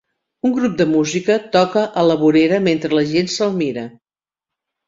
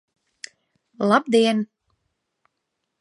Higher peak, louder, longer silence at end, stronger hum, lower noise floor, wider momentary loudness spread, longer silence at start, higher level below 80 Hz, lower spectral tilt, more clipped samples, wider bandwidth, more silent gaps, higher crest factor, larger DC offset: about the same, -2 dBFS vs -2 dBFS; first, -16 LUFS vs -20 LUFS; second, 1 s vs 1.35 s; neither; first, -87 dBFS vs -78 dBFS; second, 8 LU vs 23 LU; second, 0.45 s vs 1 s; first, -56 dBFS vs -76 dBFS; about the same, -5.5 dB/octave vs -5 dB/octave; neither; second, 7.8 kHz vs 11.5 kHz; neither; second, 16 dB vs 22 dB; neither